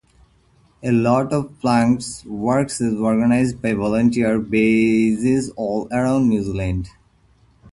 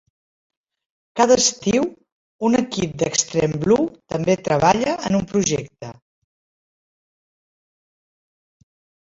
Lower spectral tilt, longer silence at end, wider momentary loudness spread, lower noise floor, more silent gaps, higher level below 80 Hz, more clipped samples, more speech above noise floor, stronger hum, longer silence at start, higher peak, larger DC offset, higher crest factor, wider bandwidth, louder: first, -6.5 dB/octave vs -4 dB/octave; second, 0.85 s vs 3.25 s; about the same, 8 LU vs 10 LU; second, -56 dBFS vs under -90 dBFS; second, none vs 2.12-2.39 s; first, -42 dBFS vs -52 dBFS; neither; second, 38 dB vs over 71 dB; neither; second, 0.8 s vs 1.15 s; about the same, -2 dBFS vs -2 dBFS; neither; about the same, 16 dB vs 20 dB; first, 11.5 kHz vs 8 kHz; about the same, -19 LUFS vs -19 LUFS